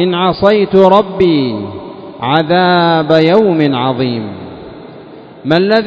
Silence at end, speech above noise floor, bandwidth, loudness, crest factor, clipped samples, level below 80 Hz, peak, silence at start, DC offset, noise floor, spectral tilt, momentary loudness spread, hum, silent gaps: 0 s; 23 dB; 8 kHz; -11 LUFS; 12 dB; 0.5%; -46 dBFS; 0 dBFS; 0 s; under 0.1%; -33 dBFS; -8 dB/octave; 20 LU; none; none